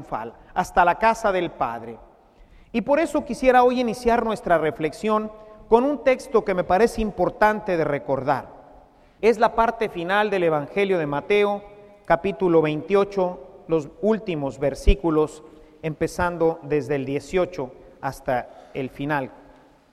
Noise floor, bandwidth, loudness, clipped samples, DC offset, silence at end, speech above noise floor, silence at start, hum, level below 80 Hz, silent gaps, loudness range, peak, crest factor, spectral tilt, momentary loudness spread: -52 dBFS; 14 kHz; -22 LUFS; under 0.1%; under 0.1%; 0.55 s; 30 dB; 0 s; none; -36 dBFS; none; 4 LU; -2 dBFS; 22 dB; -6 dB/octave; 10 LU